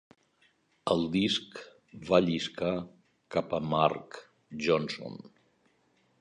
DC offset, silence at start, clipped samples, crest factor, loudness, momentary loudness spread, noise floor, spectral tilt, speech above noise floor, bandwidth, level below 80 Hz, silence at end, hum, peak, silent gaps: under 0.1%; 0.85 s; under 0.1%; 24 dB; -30 LUFS; 21 LU; -70 dBFS; -5.5 dB/octave; 40 dB; 10.5 kHz; -62 dBFS; 1.05 s; none; -8 dBFS; none